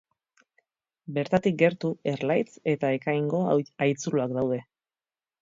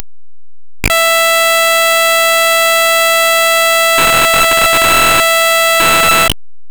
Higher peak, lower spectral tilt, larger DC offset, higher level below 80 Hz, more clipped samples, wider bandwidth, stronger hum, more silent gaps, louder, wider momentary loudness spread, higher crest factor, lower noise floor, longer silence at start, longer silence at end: second, -8 dBFS vs 0 dBFS; first, -6.5 dB/octave vs -0.5 dB/octave; second, under 0.1% vs 2%; second, -66 dBFS vs -34 dBFS; neither; second, 7.8 kHz vs over 20 kHz; neither; neither; second, -27 LUFS vs -8 LUFS; first, 7 LU vs 2 LU; first, 20 dB vs 10 dB; about the same, under -90 dBFS vs under -90 dBFS; first, 1.1 s vs 0 s; first, 0.8 s vs 0 s